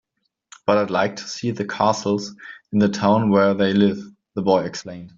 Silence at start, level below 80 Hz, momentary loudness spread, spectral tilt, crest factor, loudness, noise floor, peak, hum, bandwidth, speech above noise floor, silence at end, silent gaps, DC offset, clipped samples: 0.65 s; -60 dBFS; 14 LU; -6 dB/octave; 18 dB; -20 LUFS; -54 dBFS; -2 dBFS; none; 7.6 kHz; 34 dB; 0.1 s; none; under 0.1%; under 0.1%